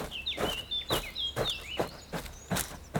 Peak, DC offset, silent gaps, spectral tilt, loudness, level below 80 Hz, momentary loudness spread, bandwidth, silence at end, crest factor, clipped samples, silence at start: -12 dBFS; under 0.1%; none; -3 dB/octave; -33 LUFS; -48 dBFS; 8 LU; over 20 kHz; 0 s; 24 dB; under 0.1%; 0 s